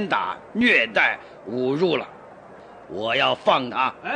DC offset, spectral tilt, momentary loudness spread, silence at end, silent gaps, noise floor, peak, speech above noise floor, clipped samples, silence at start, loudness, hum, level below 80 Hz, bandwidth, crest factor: under 0.1%; -5 dB/octave; 15 LU; 0 s; none; -44 dBFS; -6 dBFS; 22 dB; under 0.1%; 0 s; -21 LUFS; none; -64 dBFS; 9.8 kHz; 18 dB